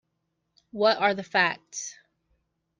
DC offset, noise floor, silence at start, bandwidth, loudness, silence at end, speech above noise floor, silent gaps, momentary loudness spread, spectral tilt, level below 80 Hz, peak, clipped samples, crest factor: under 0.1%; -78 dBFS; 0.75 s; 10 kHz; -25 LUFS; 0.85 s; 53 dB; none; 16 LU; -2.5 dB/octave; -74 dBFS; -8 dBFS; under 0.1%; 22 dB